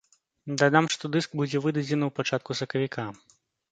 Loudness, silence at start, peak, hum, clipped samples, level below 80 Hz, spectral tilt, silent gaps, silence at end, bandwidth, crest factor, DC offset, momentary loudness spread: -27 LUFS; 0.45 s; -4 dBFS; none; under 0.1%; -70 dBFS; -5 dB/octave; none; 0.6 s; 9.4 kHz; 24 dB; under 0.1%; 13 LU